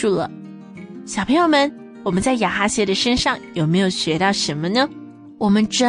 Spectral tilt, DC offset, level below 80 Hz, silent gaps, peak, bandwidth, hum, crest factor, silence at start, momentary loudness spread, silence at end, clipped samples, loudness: -4.5 dB/octave; under 0.1%; -46 dBFS; none; -4 dBFS; 10 kHz; none; 14 dB; 0 s; 17 LU; 0 s; under 0.1%; -19 LUFS